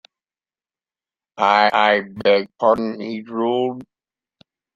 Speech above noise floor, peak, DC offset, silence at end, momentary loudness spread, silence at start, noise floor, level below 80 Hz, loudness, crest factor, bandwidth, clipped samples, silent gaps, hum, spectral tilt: over 72 dB; 0 dBFS; under 0.1%; 0.95 s; 12 LU; 1.35 s; under -90 dBFS; -64 dBFS; -18 LUFS; 20 dB; 7.6 kHz; under 0.1%; none; none; -5.5 dB/octave